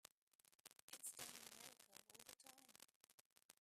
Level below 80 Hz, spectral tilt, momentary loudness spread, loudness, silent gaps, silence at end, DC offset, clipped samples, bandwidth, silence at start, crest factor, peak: under -90 dBFS; 0 dB/octave; 14 LU; -59 LUFS; 0.55-0.64 s, 0.82-0.88 s, 2.96-3.01 s, 3.14-3.36 s, 3.44-3.49 s; 0.1 s; under 0.1%; under 0.1%; 15.5 kHz; 0.5 s; 26 dB; -36 dBFS